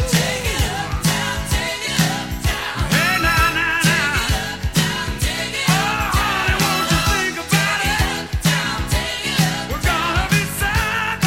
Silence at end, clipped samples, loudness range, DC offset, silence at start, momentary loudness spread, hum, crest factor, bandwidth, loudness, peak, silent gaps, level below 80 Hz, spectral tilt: 0 s; under 0.1%; 1 LU; 0.2%; 0 s; 5 LU; none; 18 dB; 16.5 kHz; -18 LUFS; -2 dBFS; none; -28 dBFS; -3.5 dB/octave